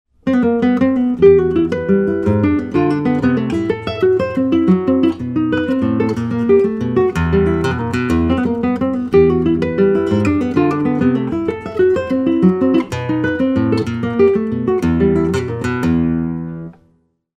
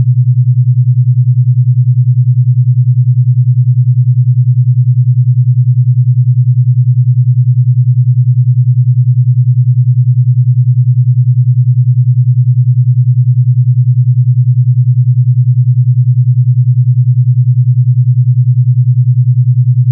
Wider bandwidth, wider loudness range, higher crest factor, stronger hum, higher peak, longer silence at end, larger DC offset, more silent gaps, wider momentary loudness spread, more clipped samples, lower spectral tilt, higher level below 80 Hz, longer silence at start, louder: first, 9.6 kHz vs 0.2 kHz; about the same, 2 LU vs 0 LU; first, 14 dB vs 6 dB; neither; about the same, 0 dBFS vs -2 dBFS; first, 0.65 s vs 0 s; neither; neither; first, 6 LU vs 0 LU; neither; second, -8.5 dB/octave vs -19.5 dB/octave; first, -36 dBFS vs -64 dBFS; first, 0.25 s vs 0 s; second, -15 LUFS vs -9 LUFS